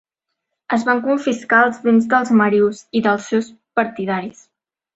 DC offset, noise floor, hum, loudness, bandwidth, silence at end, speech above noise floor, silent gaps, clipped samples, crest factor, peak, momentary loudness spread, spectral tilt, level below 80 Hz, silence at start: under 0.1%; -78 dBFS; none; -17 LUFS; 8 kHz; 0.65 s; 61 dB; none; under 0.1%; 16 dB; -2 dBFS; 9 LU; -6 dB/octave; -62 dBFS; 0.7 s